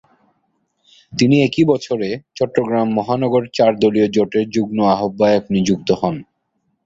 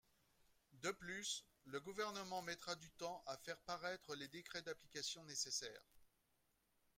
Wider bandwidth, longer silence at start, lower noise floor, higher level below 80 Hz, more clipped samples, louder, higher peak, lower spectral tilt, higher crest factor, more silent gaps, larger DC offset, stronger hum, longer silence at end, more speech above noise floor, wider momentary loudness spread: second, 7.8 kHz vs 16 kHz; first, 1.1 s vs 0.7 s; second, -69 dBFS vs -83 dBFS; first, -52 dBFS vs -82 dBFS; neither; first, -17 LUFS vs -48 LUFS; first, -2 dBFS vs -32 dBFS; first, -6.5 dB/octave vs -1.5 dB/octave; about the same, 16 dB vs 20 dB; neither; neither; neither; second, 0.65 s vs 0.9 s; first, 53 dB vs 33 dB; about the same, 8 LU vs 6 LU